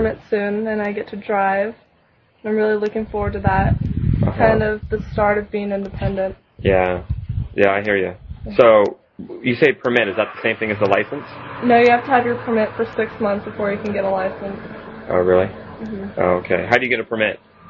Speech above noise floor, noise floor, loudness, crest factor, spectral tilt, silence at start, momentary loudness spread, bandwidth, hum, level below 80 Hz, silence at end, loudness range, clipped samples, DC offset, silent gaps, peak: 39 dB; -57 dBFS; -19 LUFS; 18 dB; -8 dB/octave; 0 s; 11 LU; 7 kHz; none; -36 dBFS; 0.35 s; 4 LU; under 0.1%; under 0.1%; none; 0 dBFS